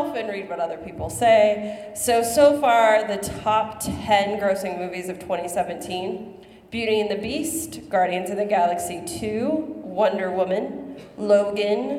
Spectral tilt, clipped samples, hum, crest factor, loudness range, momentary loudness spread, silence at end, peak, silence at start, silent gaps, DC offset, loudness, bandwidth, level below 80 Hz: -4 dB/octave; under 0.1%; none; 18 dB; 6 LU; 14 LU; 0 s; -4 dBFS; 0 s; none; under 0.1%; -22 LUFS; 16.5 kHz; -54 dBFS